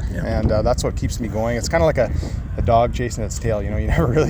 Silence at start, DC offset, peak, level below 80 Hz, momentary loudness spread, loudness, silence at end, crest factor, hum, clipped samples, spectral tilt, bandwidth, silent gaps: 0 s; under 0.1%; -4 dBFS; -26 dBFS; 7 LU; -20 LUFS; 0 s; 14 dB; none; under 0.1%; -6 dB/octave; over 20 kHz; none